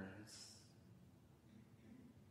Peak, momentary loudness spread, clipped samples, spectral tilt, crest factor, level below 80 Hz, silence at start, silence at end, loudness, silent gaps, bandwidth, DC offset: -38 dBFS; 11 LU; under 0.1%; -4 dB/octave; 22 dB; -80 dBFS; 0 s; 0 s; -62 LUFS; none; 15.5 kHz; under 0.1%